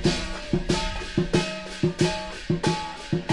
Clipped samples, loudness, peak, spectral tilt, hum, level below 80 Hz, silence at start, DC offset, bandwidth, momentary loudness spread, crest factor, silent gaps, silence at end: under 0.1%; -27 LUFS; -8 dBFS; -5 dB/octave; none; -38 dBFS; 0 s; 0.4%; 11.5 kHz; 6 LU; 18 dB; none; 0 s